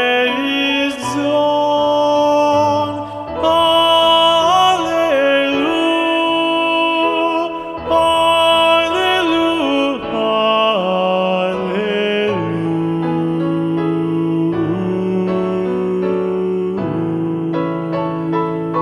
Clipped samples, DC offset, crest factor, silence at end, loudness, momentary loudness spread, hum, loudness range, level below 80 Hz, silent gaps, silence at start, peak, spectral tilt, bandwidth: under 0.1%; under 0.1%; 14 dB; 0 s; -15 LUFS; 8 LU; none; 5 LU; -50 dBFS; none; 0 s; 0 dBFS; -5 dB/octave; 13.5 kHz